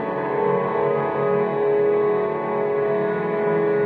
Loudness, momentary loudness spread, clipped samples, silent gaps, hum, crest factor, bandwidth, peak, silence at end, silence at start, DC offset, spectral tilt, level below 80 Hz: -21 LUFS; 3 LU; under 0.1%; none; none; 12 dB; 4.4 kHz; -10 dBFS; 0 s; 0 s; under 0.1%; -9.5 dB/octave; -66 dBFS